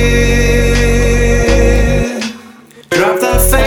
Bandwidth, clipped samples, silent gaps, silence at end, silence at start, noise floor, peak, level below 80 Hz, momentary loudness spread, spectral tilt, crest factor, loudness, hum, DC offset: 19.5 kHz; under 0.1%; none; 0 s; 0 s; -37 dBFS; 0 dBFS; -14 dBFS; 6 LU; -5 dB/octave; 10 dB; -12 LUFS; none; under 0.1%